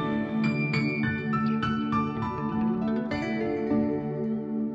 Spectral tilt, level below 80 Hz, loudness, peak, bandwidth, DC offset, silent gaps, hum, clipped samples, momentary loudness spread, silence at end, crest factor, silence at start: -8 dB/octave; -54 dBFS; -28 LUFS; -14 dBFS; 7.8 kHz; under 0.1%; none; none; under 0.1%; 4 LU; 0 s; 12 dB; 0 s